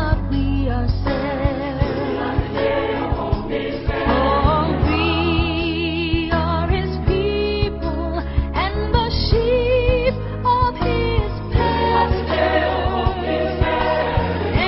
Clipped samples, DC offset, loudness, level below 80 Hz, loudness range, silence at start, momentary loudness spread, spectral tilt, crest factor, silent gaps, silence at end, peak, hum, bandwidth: under 0.1%; under 0.1%; -20 LUFS; -24 dBFS; 2 LU; 0 s; 5 LU; -11 dB/octave; 16 dB; none; 0 s; -2 dBFS; none; 5.8 kHz